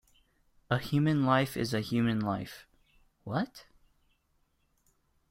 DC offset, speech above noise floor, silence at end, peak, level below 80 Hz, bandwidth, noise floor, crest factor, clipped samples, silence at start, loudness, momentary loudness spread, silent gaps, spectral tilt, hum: under 0.1%; 44 dB; 1.7 s; -12 dBFS; -62 dBFS; 16 kHz; -73 dBFS; 20 dB; under 0.1%; 0.7 s; -31 LUFS; 14 LU; none; -6.5 dB/octave; none